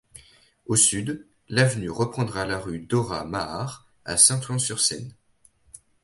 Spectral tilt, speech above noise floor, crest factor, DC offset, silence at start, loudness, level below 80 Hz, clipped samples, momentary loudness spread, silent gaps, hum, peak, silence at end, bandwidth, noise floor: -3 dB/octave; 37 dB; 24 dB; under 0.1%; 0.15 s; -23 LUFS; -54 dBFS; under 0.1%; 17 LU; none; none; -2 dBFS; 0.95 s; 12 kHz; -61 dBFS